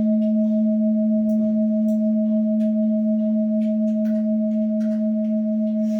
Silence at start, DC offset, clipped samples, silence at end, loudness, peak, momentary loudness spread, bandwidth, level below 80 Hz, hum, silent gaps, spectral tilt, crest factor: 0 s; under 0.1%; under 0.1%; 0 s; -21 LUFS; -12 dBFS; 2 LU; 2.3 kHz; -70 dBFS; none; none; -11 dB/octave; 8 dB